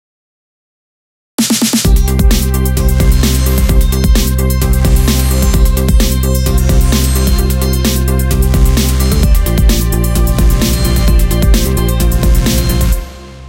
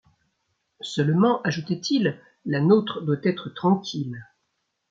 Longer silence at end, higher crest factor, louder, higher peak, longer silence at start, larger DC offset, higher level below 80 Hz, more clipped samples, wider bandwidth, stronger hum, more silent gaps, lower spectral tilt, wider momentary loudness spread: second, 0 s vs 0.7 s; second, 10 dB vs 18 dB; first, -12 LUFS vs -24 LUFS; first, 0 dBFS vs -6 dBFS; first, 1.4 s vs 0.85 s; neither; first, -12 dBFS vs -68 dBFS; neither; first, 17 kHz vs 7.8 kHz; neither; neither; second, -5 dB/octave vs -6.5 dB/octave; second, 2 LU vs 13 LU